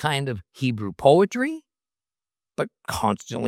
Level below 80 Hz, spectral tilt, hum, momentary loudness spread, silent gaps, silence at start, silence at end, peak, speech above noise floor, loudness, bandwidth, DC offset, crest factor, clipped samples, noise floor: -56 dBFS; -5.5 dB/octave; none; 14 LU; none; 0 s; 0 s; -4 dBFS; over 67 dB; -23 LUFS; 16.5 kHz; under 0.1%; 22 dB; under 0.1%; under -90 dBFS